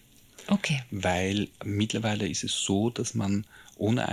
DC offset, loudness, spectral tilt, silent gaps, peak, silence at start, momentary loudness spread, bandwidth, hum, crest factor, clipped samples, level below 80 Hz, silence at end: under 0.1%; -29 LUFS; -4.5 dB/octave; none; -10 dBFS; 0.4 s; 5 LU; 14.5 kHz; none; 18 dB; under 0.1%; -62 dBFS; 0 s